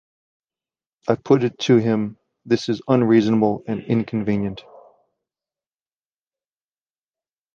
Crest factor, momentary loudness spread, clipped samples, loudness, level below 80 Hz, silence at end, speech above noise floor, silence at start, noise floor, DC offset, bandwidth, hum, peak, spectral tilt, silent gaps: 20 dB; 12 LU; under 0.1%; -20 LUFS; -58 dBFS; 2.95 s; over 71 dB; 1.05 s; under -90 dBFS; under 0.1%; 7.4 kHz; none; -4 dBFS; -7 dB/octave; none